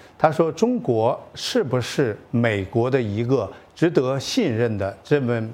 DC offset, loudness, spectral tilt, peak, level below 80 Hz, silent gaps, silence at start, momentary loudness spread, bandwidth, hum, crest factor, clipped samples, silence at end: under 0.1%; -22 LUFS; -6 dB/octave; -2 dBFS; -58 dBFS; none; 0.2 s; 4 LU; 16 kHz; none; 20 dB; under 0.1%; 0 s